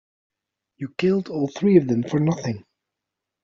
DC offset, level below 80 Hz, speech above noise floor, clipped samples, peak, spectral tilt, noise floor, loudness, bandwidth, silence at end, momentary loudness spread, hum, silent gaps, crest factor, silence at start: under 0.1%; -62 dBFS; 64 dB; under 0.1%; -4 dBFS; -7.5 dB/octave; -84 dBFS; -22 LUFS; 7.4 kHz; 0.85 s; 15 LU; none; none; 20 dB; 0.8 s